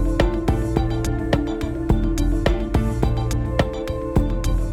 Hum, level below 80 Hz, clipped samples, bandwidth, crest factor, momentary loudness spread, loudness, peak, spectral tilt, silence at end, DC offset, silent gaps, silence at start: none; -24 dBFS; under 0.1%; 14 kHz; 16 dB; 3 LU; -22 LUFS; -4 dBFS; -7 dB/octave; 0 s; under 0.1%; none; 0 s